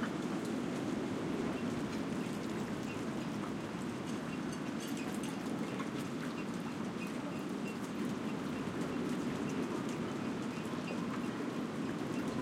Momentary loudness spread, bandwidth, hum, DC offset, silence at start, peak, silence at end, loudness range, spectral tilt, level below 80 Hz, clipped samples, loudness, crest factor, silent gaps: 3 LU; 16.5 kHz; none; under 0.1%; 0 s; -24 dBFS; 0 s; 1 LU; -5.5 dB/octave; -68 dBFS; under 0.1%; -39 LUFS; 14 dB; none